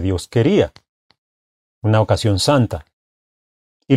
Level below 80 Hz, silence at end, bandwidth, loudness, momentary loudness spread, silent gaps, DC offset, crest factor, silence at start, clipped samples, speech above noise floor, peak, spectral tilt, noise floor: -44 dBFS; 0 s; 14.5 kHz; -17 LUFS; 8 LU; 0.89-1.09 s, 1.18-1.82 s, 2.93-3.80 s; under 0.1%; 18 dB; 0 s; under 0.1%; over 74 dB; -2 dBFS; -6 dB/octave; under -90 dBFS